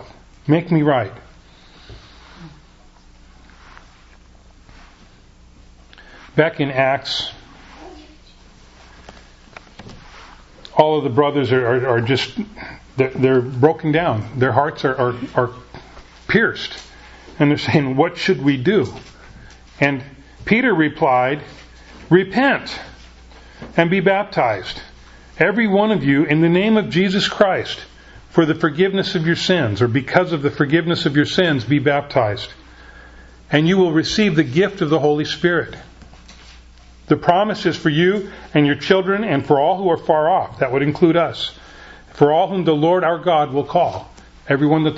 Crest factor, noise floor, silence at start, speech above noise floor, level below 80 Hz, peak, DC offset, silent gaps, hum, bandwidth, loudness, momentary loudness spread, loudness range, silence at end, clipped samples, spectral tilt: 18 dB; -47 dBFS; 0 s; 30 dB; -48 dBFS; 0 dBFS; under 0.1%; none; none; 8 kHz; -17 LUFS; 11 LU; 6 LU; 0 s; under 0.1%; -6.5 dB/octave